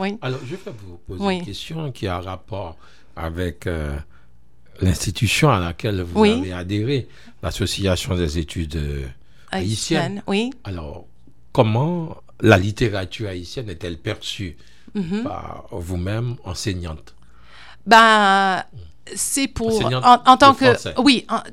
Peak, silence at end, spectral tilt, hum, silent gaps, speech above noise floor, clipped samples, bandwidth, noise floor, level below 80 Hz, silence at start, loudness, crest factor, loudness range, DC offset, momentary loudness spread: 0 dBFS; 0 s; -5 dB/octave; none; none; 35 dB; under 0.1%; 16 kHz; -54 dBFS; -40 dBFS; 0 s; -19 LUFS; 20 dB; 12 LU; 0.9%; 19 LU